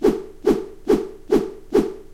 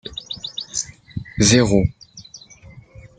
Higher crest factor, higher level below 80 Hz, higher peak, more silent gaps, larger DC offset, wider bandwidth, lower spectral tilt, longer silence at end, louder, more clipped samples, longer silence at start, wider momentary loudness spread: about the same, 16 dB vs 20 dB; about the same, -40 dBFS vs -40 dBFS; about the same, -4 dBFS vs -2 dBFS; neither; first, 0.1% vs under 0.1%; first, 16 kHz vs 9.6 kHz; first, -6.5 dB/octave vs -4 dB/octave; second, 0 s vs 0.4 s; second, -22 LUFS vs -19 LUFS; neither; about the same, 0 s vs 0.05 s; second, 1 LU vs 26 LU